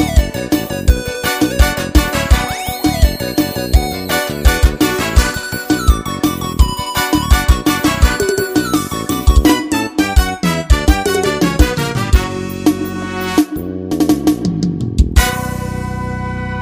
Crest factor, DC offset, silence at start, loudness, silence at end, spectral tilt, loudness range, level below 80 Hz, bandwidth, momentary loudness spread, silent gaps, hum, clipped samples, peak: 14 dB; under 0.1%; 0 s; -15 LUFS; 0 s; -5 dB/octave; 2 LU; -16 dBFS; 16 kHz; 7 LU; none; none; 0.3%; 0 dBFS